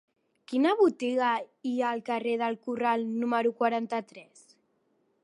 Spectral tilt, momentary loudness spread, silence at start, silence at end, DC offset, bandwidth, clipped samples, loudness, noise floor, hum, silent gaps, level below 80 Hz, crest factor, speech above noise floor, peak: -5 dB/octave; 9 LU; 0.5 s; 1 s; under 0.1%; 11.5 kHz; under 0.1%; -28 LUFS; -72 dBFS; none; none; -84 dBFS; 18 dB; 44 dB; -12 dBFS